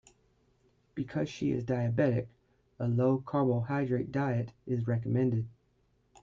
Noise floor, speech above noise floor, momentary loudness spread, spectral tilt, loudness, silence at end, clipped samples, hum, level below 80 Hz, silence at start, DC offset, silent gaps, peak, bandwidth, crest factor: -71 dBFS; 41 dB; 8 LU; -9 dB/octave; -32 LUFS; 0.75 s; under 0.1%; none; -64 dBFS; 0.95 s; under 0.1%; none; -14 dBFS; 7.4 kHz; 18 dB